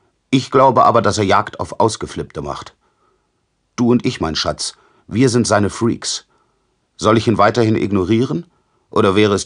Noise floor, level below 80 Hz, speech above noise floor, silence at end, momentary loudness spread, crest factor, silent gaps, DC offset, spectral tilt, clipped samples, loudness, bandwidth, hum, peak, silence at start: -66 dBFS; -46 dBFS; 51 dB; 0 s; 13 LU; 16 dB; none; under 0.1%; -5 dB/octave; under 0.1%; -16 LUFS; 10.5 kHz; none; 0 dBFS; 0.3 s